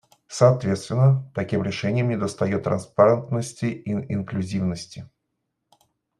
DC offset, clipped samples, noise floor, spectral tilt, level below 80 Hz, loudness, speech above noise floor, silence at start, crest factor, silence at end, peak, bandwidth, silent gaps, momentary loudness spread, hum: under 0.1%; under 0.1%; -78 dBFS; -7 dB/octave; -60 dBFS; -23 LUFS; 56 dB; 0.3 s; 20 dB; 1.15 s; -2 dBFS; 11.5 kHz; none; 10 LU; none